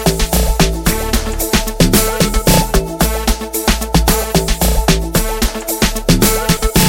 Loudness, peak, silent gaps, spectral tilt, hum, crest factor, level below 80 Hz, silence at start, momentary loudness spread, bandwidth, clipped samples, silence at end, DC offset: -14 LUFS; 0 dBFS; none; -4 dB/octave; none; 14 dB; -18 dBFS; 0 s; 5 LU; 17 kHz; under 0.1%; 0 s; under 0.1%